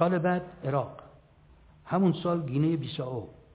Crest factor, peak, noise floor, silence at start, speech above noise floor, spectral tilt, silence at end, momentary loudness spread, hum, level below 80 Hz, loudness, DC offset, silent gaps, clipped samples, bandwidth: 20 dB; -10 dBFS; -57 dBFS; 0 s; 29 dB; -7 dB/octave; 0.2 s; 12 LU; none; -60 dBFS; -30 LUFS; under 0.1%; none; under 0.1%; 4 kHz